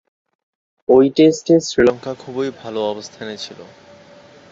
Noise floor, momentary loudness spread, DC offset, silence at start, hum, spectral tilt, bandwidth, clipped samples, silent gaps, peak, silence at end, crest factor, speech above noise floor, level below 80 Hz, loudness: -44 dBFS; 17 LU; under 0.1%; 0.9 s; none; -5.5 dB/octave; 7.8 kHz; under 0.1%; none; -2 dBFS; 0.9 s; 16 dB; 28 dB; -54 dBFS; -16 LUFS